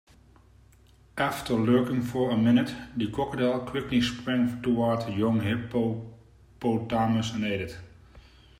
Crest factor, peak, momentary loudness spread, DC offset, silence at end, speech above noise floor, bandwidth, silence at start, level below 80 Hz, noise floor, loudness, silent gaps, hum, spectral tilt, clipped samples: 16 dB; -10 dBFS; 9 LU; under 0.1%; 0.4 s; 31 dB; 15.5 kHz; 1.15 s; -54 dBFS; -57 dBFS; -27 LUFS; none; none; -6.5 dB/octave; under 0.1%